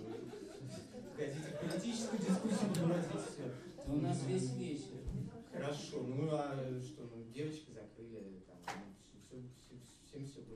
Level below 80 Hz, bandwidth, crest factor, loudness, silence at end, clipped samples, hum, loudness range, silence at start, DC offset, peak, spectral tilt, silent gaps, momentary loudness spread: -62 dBFS; 14 kHz; 18 dB; -42 LUFS; 0 s; under 0.1%; none; 11 LU; 0 s; under 0.1%; -24 dBFS; -6 dB/octave; none; 17 LU